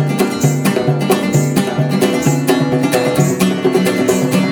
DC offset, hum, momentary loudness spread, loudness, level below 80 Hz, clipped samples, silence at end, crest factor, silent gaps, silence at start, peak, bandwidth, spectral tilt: under 0.1%; none; 2 LU; -14 LUFS; -50 dBFS; under 0.1%; 0 s; 14 dB; none; 0 s; 0 dBFS; 19.5 kHz; -5.5 dB/octave